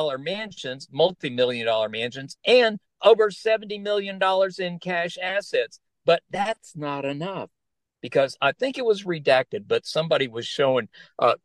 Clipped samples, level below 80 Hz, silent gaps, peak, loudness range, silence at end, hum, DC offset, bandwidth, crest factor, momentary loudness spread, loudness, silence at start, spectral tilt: under 0.1%; -70 dBFS; none; -4 dBFS; 5 LU; 0.1 s; none; under 0.1%; 11.5 kHz; 20 dB; 12 LU; -24 LUFS; 0 s; -4.5 dB/octave